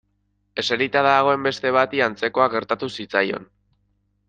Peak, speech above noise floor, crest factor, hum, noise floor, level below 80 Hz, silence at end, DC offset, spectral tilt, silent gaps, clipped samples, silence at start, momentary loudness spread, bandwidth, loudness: -2 dBFS; 48 dB; 20 dB; 50 Hz at -45 dBFS; -69 dBFS; -64 dBFS; 0.85 s; under 0.1%; -4.5 dB/octave; none; under 0.1%; 0.55 s; 9 LU; 9.2 kHz; -20 LUFS